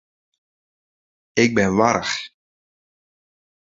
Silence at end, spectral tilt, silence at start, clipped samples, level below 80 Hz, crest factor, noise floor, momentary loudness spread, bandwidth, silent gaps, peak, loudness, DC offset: 1.4 s; -4.5 dB/octave; 1.35 s; under 0.1%; -54 dBFS; 24 dB; under -90 dBFS; 10 LU; 7.8 kHz; none; 0 dBFS; -19 LUFS; under 0.1%